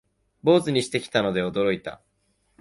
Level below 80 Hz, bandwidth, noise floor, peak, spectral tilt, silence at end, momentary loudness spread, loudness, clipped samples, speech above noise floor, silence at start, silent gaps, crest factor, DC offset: -58 dBFS; 11.5 kHz; -69 dBFS; -6 dBFS; -5.5 dB/octave; 0.65 s; 8 LU; -23 LUFS; under 0.1%; 46 dB; 0.45 s; none; 18 dB; under 0.1%